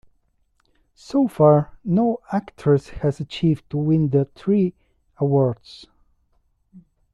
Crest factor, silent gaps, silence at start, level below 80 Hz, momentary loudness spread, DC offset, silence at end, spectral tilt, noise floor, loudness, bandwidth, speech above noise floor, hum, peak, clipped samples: 18 dB; none; 1.1 s; -52 dBFS; 9 LU; under 0.1%; 0.35 s; -9 dB/octave; -65 dBFS; -21 LUFS; 11.5 kHz; 46 dB; none; -4 dBFS; under 0.1%